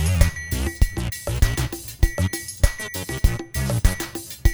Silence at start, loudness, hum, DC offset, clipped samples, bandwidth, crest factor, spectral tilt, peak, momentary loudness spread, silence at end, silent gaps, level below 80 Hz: 0 s; -24 LUFS; none; under 0.1%; under 0.1%; over 20 kHz; 20 dB; -4.5 dB/octave; -2 dBFS; 6 LU; 0 s; none; -24 dBFS